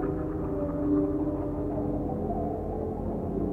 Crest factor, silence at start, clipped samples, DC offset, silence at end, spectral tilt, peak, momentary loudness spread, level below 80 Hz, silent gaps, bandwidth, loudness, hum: 14 dB; 0 s; under 0.1%; under 0.1%; 0 s; -11.5 dB/octave; -14 dBFS; 6 LU; -40 dBFS; none; 3 kHz; -30 LUFS; none